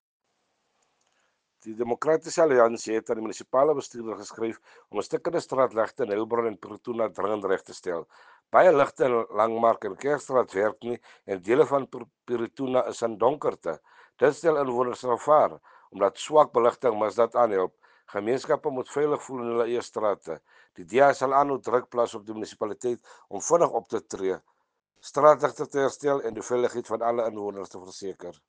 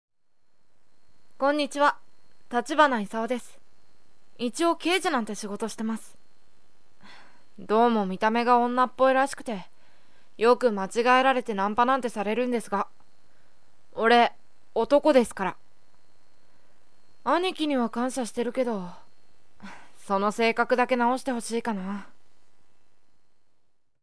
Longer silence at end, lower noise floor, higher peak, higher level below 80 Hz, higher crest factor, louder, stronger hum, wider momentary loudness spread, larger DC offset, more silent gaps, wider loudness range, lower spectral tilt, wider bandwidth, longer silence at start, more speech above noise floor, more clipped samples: first, 0.15 s vs 0 s; first, -75 dBFS vs -67 dBFS; about the same, -4 dBFS vs -6 dBFS; about the same, -72 dBFS vs -68 dBFS; about the same, 22 dB vs 22 dB; about the same, -26 LUFS vs -25 LUFS; neither; about the same, 15 LU vs 13 LU; second, under 0.1% vs 0.9%; neither; about the same, 4 LU vs 6 LU; about the same, -5 dB/octave vs -4 dB/octave; second, 9.8 kHz vs 11 kHz; first, 1.65 s vs 0.1 s; first, 50 dB vs 42 dB; neither